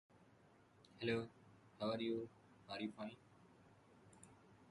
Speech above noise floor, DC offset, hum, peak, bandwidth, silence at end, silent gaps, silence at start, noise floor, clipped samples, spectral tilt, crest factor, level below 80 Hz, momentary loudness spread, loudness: 25 dB; under 0.1%; none; -28 dBFS; 11 kHz; 0 s; none; 0.15 s; -70 dBFS; under 0.1%; -6 dB/octave; 22 dB; -80 dBFS; 25 LU; -46 LUFS